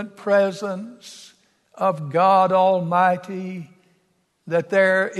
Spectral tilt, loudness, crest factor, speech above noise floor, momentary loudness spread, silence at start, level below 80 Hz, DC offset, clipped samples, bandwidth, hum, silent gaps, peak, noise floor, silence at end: -6 dB/octave; -20 LUFS; 16 dB; 46 dB; 18 LU; 0 s; -74 dBFS; under 0.1%; under 0.1%; 12 kHz; none; none; -4 dBFS; -66 dBFS; 0 s